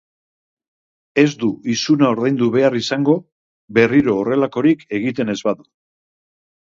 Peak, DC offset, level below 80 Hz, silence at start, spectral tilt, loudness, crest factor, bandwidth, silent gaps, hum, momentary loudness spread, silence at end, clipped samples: 0 dBFS; under 0.1%; -58 dBFS; 1.15 s; -6 dB/octave; -17 LUFS; 18 dB; 7.6 kHz; 3.32-3.68 s; none; 8 LU; 1.2 s; under 0.1%